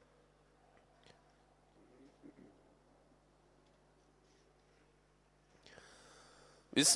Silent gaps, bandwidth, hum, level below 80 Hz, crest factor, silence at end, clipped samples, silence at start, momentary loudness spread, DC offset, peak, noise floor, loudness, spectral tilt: none; 11.5 kHz; 50 Hz at -75 dBFS; -76 dBFS; 28 dB; 0 s; under 0.1%; 6.75 s; 21 LU; under 0.1%; -16 dBFS; -71 dBFS; -33 LUFS; -1.5 dB/octave